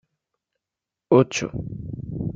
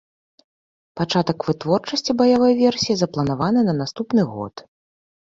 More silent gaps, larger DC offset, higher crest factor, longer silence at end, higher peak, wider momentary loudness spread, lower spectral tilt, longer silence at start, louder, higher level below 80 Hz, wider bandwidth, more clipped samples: neither; neither; about the same, 22 dB vs 18 dB; second, 0 s vs 0.8 s; about the same, -4 dBFS vs -4 dBFS; first, 15 LU vs 10 LU; about the same, -6 dB/octave vs -6 dB/octave; first, 1.1 s vs 0.95 s; about the same, -22 LUFS vs -20 LUFS; first, -48 dBFS vs -54 dBFS; about the same, 7.8 kHz vs 7.6 kHz; neither